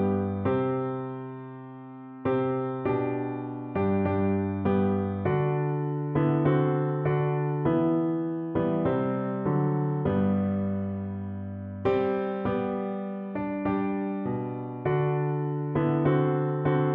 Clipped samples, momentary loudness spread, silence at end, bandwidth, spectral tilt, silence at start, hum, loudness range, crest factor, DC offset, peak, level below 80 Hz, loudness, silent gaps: under 0.1%; 9 LU; 0 s; 3.8 kHz; -12 dB/octave; 0 s; none; 4 LU; 14 dB; under 0.1%; -12 dBFS; -58 dBFS; -28 LUFS; none